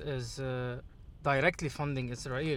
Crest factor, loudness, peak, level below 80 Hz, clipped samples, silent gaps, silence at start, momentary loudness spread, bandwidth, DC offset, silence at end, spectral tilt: 22 dB; -34 LUFS; -12 dBFS; -52 dBFS; under 0.1%; none; 0 s; 9 LU; 14.5 kHz; under 0.1%; 0 s; -5.5 dB/octave